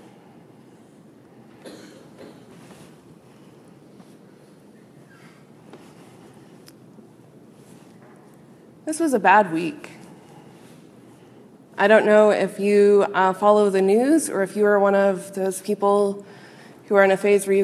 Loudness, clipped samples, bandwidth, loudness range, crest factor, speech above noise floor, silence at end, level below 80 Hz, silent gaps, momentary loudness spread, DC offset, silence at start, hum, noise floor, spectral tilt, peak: -19 LUFS; under 0.1%; 14 kHz; 6 LU; 20 dB; 31 dB; 0 s; -76 dBFS; none; 15 LU; under 0.1%; 1.65 s; none; -49 dBFS; -5 dB/octave; -2 dBFS